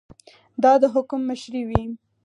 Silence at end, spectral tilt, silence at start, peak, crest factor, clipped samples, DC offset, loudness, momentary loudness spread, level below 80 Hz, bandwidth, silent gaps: 0.3 s; -7 dB/octave; 0.6 s; 0 dBFS; 22 dB; under 0.1%; under 0.1%; -21 LUFS; 15 LU; -42 dBFS; 10.5 kHz; none